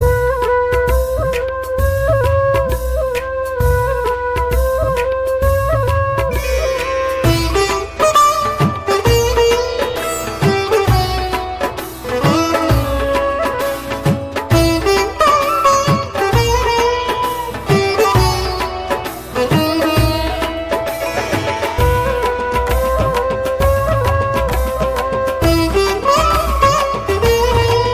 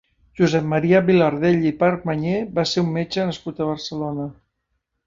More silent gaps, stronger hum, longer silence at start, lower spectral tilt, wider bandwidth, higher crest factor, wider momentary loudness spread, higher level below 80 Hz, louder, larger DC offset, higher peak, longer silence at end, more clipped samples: neither; neither; second, 0 s vs 0.35 s; second, -5 dB/octave vs -6.5 dB/octave; first, 16 kHz vs 7.6 kHz; second, 12 dB vs 18 dB; second, 7 LU vs 10 LU; first, -24 dBFS vs -52 dBFS; first, -15 LUFS vs -20 LUFS; first, 0.2% vs under 0.1%; about the same, -2 dBFS vs -4 dBFS; second, 0 s vs 0.75 s; neither